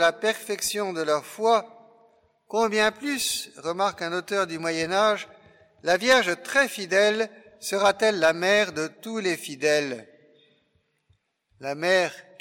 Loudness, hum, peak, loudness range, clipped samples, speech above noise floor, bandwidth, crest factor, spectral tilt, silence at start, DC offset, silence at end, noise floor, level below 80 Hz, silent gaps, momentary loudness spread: -24 LUFS; none; -8 dBFS; 5 LU; under 0.1%; 46 dB; 17 kHz; 18 dB; -2.5 dB/octave; 0 s; under 0.1%; 0.2 s; -70 dBFS; -66 dBFS; none; 10 LU